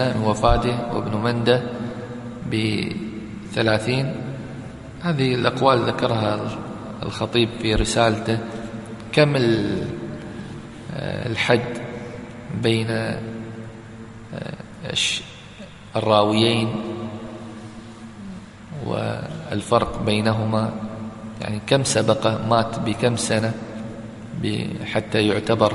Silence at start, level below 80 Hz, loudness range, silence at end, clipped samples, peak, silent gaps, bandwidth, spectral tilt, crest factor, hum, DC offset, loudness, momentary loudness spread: 0 s; -40 dBFS; 4 LU; 0 s; under 0.1%; 0 dBFS; none; 11.5 kHz; -5 dB/octave; 22 dB; none; under 0.1%; -22 LUFS; 17 LU